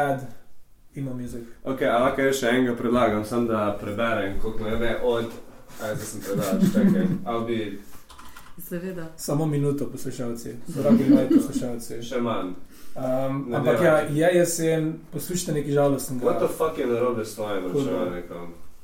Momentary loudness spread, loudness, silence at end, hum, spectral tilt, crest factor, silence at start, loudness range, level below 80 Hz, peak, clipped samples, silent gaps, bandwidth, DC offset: 15 LU; -24 LUFS; 0 s; none; -6 dB/octave; 18 dB; 0 s; 4 LU; -44 dBFS; -6 dBFS; under 0.1%; none; 16.5 kHz; under 0.1%